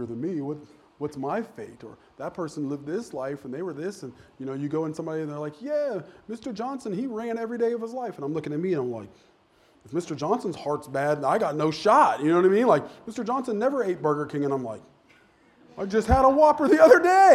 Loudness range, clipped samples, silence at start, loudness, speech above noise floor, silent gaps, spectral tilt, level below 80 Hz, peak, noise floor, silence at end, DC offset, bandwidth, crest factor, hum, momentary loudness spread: 10 LU; under 0.1%; 0 s; -25 LUFS; 36 dB; none; -6.5 dB/octave; -46 dBFS; -4 dBFS; -60 dBFS; 0 s; under 0.1%; 14 kHz; 22 dB; none; 17 LU